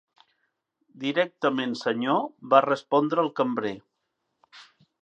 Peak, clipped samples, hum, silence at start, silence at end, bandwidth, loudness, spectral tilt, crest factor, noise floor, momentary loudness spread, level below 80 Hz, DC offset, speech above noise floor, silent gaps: -4 dBFS; under 0.1%; none; 0.95 s; 0.4 s; 8.4 kHz; -25 LUFS; -6 dB/octave; 24 dB; -79 dBFS; 10 LU; -78 dBFS; under 0.1%; 54 dB; none